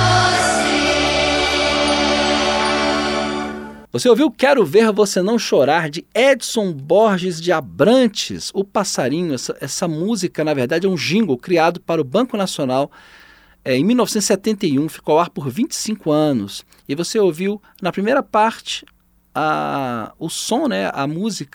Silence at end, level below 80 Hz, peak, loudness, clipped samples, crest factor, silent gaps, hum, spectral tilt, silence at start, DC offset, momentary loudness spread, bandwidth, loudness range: 0.1 s; -44 dBFS; -2 dBFS; -17 LUFS; under 0.1%; 16 dB; none; none; -4 dB/octave; 0 s; under 0.1%; 10 LU; 18.5 kHz; 4 LU